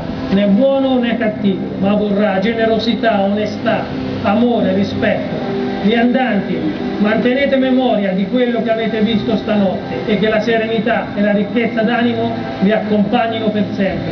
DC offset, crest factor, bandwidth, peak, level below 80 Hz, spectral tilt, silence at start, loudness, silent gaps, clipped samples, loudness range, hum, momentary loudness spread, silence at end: under 0.1%; 14 dB; 6.4 kHz; 0 dBFS; -44 dBFS; -5 dB/octave; 0 s; -15 LUFS; none; under 0.1%; 1 LU; none; 5 LU; 0 s